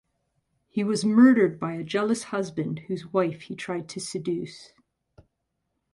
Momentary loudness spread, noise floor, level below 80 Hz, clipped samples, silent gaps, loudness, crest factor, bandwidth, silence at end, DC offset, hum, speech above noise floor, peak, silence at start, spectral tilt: 15 LU; -79 dBFS; -68 dBFS; under 0.1%; none; -25 LUFS; 20 dB; 11.5 kHz; 1.3 s; under 0.1%; none; 54 dB; -8 dBFS; 0.75 s; -6 dB/octave